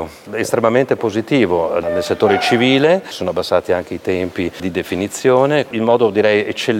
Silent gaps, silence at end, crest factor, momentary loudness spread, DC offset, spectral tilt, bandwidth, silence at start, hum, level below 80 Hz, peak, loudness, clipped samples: none; 0 s; 14 dB; 8 LU; under 0.1%; -5 dB/octave; 16.5 kHz; 0 s; none; -52 dBFS; 0 dBFS; -16 LUFS; under 0.1%